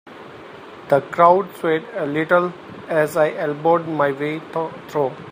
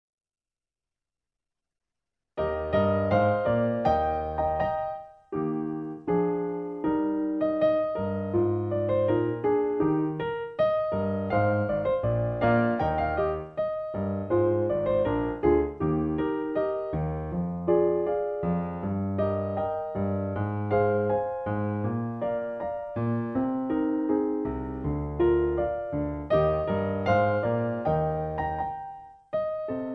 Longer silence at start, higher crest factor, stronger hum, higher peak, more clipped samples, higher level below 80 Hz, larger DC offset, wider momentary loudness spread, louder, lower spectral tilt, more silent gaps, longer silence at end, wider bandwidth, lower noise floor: second, 0.05 s vs 2.35 s; about the same, 20 dB vs 18 dB; neither; first, 0 dBFS vs -10 dBFS; neither; second, -66 dBFS vs -46 dBFS; neither; first, 24 LU vs 7 LU; first, -20 LUFS vs -27 LUFS; second, -6.5 dB/octave vs -10 dB/octave; neither; about the same, 0 s vs 0 s; first, 15.5 kHz vs 6 kHz; second, -39 dBFS vs under -90 dBFS